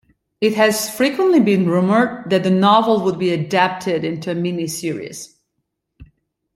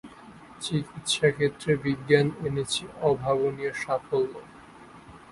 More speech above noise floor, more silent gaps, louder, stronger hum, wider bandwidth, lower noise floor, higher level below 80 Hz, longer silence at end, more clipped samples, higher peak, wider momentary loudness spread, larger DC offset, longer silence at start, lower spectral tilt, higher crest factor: first, 58 dB vs 22 dB; neither; first, -17 LUFS vs -27 LUFS; neither; first, 16.5 kHz vs 11.5 kHz; first, -74 dBFS vs -49 dBFS; about the same, -58 dBFS vs -58 dBFS; first, 0.5 s vs 0.15 s; neither; first, 0 dBFS vs -4 dBFS; about the same, 10 LU vs 9 LU; neither; first, 0.4 s vs 0.05 s; about the same, -5.5 dB/octave vs -5 dB/octave; second, 16 dB vs 22 dB